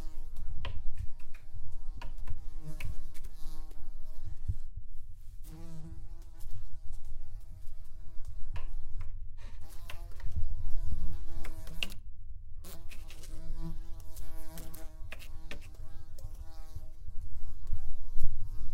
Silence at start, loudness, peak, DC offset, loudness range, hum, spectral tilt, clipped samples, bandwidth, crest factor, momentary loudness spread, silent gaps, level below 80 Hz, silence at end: 0 s; -46 LUFS; -8 dBFS; under 0.1%; 6 LU; none; -5 dB/octave; under 0.1%; 4.2 kHz; 18 dB; 10 LU; none; -36 dBFS; 0 s